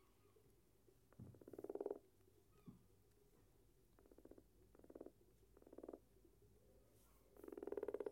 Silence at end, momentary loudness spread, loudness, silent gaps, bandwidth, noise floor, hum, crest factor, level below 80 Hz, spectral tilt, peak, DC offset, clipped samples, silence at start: 0 s; 17 LU; -55 LUFS; none; 16.5 kHz; -75 dBFS; none; 26 dB; -78 dBFS; -7 dB/octave; -32 dBFS; under 0.1%; under 0.1%; 0 s